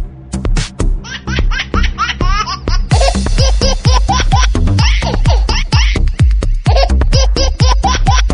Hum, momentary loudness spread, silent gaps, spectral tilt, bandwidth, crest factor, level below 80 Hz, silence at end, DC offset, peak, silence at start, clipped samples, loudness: none; 7 LU; none; -4.5 dB/octave; 10.5 kHz; 10 dB; -12 dBFS; 0 s; under 0.1%; 0 dBFS; 0 s; under 0.1%; -13 LUFS